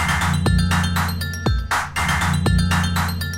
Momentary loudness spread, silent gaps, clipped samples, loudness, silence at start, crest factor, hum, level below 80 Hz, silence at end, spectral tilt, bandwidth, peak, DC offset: 4 LU; none; under 0.1%; -20 LUFS; 0 s; 12 dB; none; -28 dBFS; 0 s; -4.5 dB/octave; 17 kHz; -6 dBFS; under 0.1%